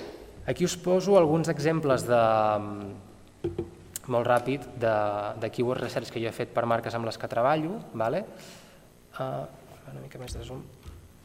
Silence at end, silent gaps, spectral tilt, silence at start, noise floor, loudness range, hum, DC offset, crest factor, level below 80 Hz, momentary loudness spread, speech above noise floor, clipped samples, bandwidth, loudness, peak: 0.2 s; none; -6 dB/octave; 0 s; -53 dBFS; 7 LU; none; under 0.1%; 22 dB; -54 dBFS; 20 LU; 26 dB; under 0.1%; 16.5 kHz; -27 LUFS; -6 dBFS